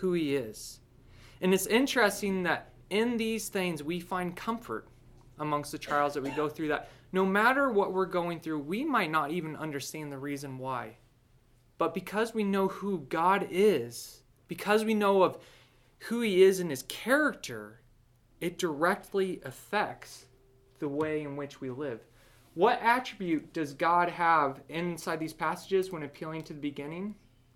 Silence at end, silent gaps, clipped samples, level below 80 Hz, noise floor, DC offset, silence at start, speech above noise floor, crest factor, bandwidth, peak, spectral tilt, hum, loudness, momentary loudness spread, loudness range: 0.45 s; none; under 0.1%; -64 dBFS; -63 dBFS; under 0.1%; 0 s; 33 dB; 20 dB; 17 kHz; -12 dBFS; -5 dB/octave; none; -30 LUFS; 14 LU; 6 LU